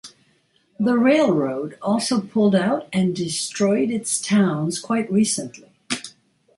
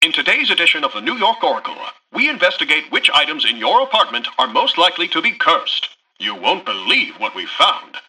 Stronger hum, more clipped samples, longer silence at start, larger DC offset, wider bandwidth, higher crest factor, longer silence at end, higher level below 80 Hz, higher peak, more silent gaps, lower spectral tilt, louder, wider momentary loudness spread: neither; neither; about the same, 0.05 s vs 0 s; neither; second, 11.5 kHz vs 15 kHz; about the same, 16 dB vs 16 dB; first, 0.5 s vs 0.1 s; about the same, -64 dBFS vs -66 dBFS; second, -6 dBFS vs -2 dBFS; neither; first, -5 dB/octave vs -1.5 dB/octave; second, -21 LUFS vs -15 LUFS; about the same, 11 LU vs 10 LU